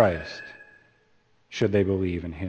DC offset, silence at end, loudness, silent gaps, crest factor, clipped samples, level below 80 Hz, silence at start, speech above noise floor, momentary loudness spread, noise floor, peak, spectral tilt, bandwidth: under 0.1%; 0 s; -26 LUFS; none; 22 dB; under 0.1%; -50 dBFS; 0 s; 39 dB; 19 LU; -63 dBFS; -4 dBFS; -7 dB/octave; 8.2 kHz